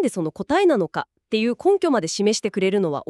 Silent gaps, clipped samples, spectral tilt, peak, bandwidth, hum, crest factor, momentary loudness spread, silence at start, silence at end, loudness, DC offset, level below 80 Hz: none; under 0.1%; -4.5 dB/octave; -8 dBFS; 12 kHz; none; 14 dB; 8 LU; 0 s; 0.05 s; -21 LUFS; under 0.1%; -60 dBFS